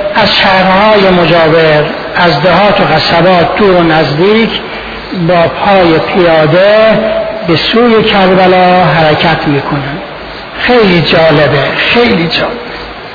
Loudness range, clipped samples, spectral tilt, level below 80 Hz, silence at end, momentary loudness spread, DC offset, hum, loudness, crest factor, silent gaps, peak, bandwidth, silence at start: 2 LU; 0.8%; -7 dB/octave; -34 dBFS; 0 s; 10 LU; under 0.1%; none; -7 LUFS; 6 dB; none; 0 dBFS; 5.4 kHz; 0 s